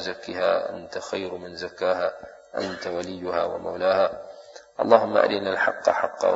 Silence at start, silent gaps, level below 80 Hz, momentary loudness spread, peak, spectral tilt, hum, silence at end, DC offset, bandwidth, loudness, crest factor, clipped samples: 0 s; none; -66 dBFS; 16 LU; -2 dBFS; -4.5 dB/octave; none; 0 s; under 0.1%; 8 kHz; -25 LUFS; 24 dB; under 0.1%